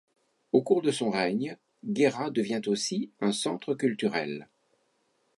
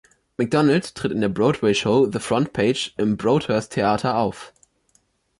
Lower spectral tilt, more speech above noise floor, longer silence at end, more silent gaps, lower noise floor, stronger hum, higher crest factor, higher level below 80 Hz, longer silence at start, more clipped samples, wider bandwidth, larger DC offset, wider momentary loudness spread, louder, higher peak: about the same, -4.5 dB/octave vs -5.5 dB/octave; about the same, 44 dB vs 44 dB; about the same, 0.95 s vs 0.9 s; neither; first, -72 dBFS vs -64 dBFS; neither; first, 22 dB vs 14 dB; second, -76 dBFS vs -52 dBFS; first, 0.55 s vs 0.4 s; neither; about the same, 11.5 kHz vs 11.5 kHz; neither; about the same, 9 LU vs 7 LU; second, -29 LUFS vs -21 LUFS; about the same, -8 dBFS vs -8 dBFS